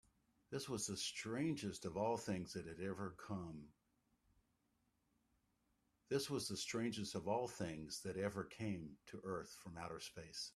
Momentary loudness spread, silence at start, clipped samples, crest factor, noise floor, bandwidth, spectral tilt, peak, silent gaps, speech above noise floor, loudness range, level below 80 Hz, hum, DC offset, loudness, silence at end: 9 LU; 0.5 s; under 0.1%; 20 dB; -83 dBFS; 14 kHz; -4.5 dB/octave; -26 dBFS; none; 38 dB; 8 LU; -74 dBFS; none; under 0.1%; -46 LUFS; 0.05 s